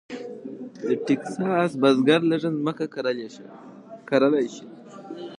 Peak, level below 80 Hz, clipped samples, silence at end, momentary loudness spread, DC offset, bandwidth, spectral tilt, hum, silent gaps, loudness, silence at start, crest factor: -6 dBFS; -76 dBFS; under 0.1%; 0.05 s; 24 LU; under 0.1%; 10.5 kHz; -6.5 dB/octave; none; none; -23 LUFS; 0.1 s; 18 dB